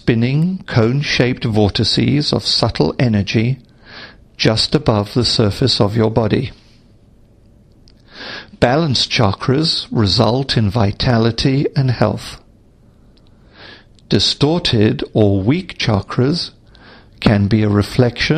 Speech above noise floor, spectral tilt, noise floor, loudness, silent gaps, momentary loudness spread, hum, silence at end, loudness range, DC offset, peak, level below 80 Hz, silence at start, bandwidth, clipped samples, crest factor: 33 dB; -6 dB/octave; -48 dBFS; -15 LUFS; none; 6 LU; none; 0 s; 4 LU; under 0.1%; 0 dBFS; -38 dBFS; 0.05 s; 10 kHz; under 0.1%; 16 dB